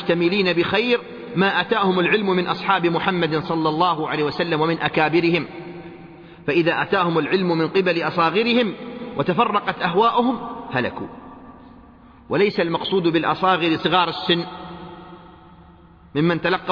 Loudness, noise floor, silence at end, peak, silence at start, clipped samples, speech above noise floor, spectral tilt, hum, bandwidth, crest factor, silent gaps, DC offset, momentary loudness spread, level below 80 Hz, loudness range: -20 LUFS; -47 dBFS; 0 s; -4 dBFS; 0 s; under 0.1%; 28 dB; -7.5 dB/octave; none; 5.4 kHz; 16 dB; none; under 0.1%; 14 LU; -56 dBFS; 3 LU